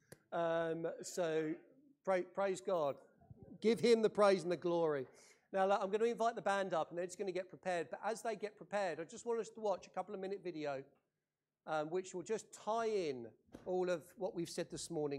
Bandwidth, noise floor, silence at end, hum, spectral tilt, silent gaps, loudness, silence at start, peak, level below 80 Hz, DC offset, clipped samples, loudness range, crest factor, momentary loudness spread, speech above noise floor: 14 kHz; under -90 dBFS; 0 s; none; -5 dB/octave; none; -39 LUFS; 0.3 s; -18 dBFS; -80 dBFS; under 0.1%; under 0.1%; 8 LU; 20 dB; 10 LU; over 52 dB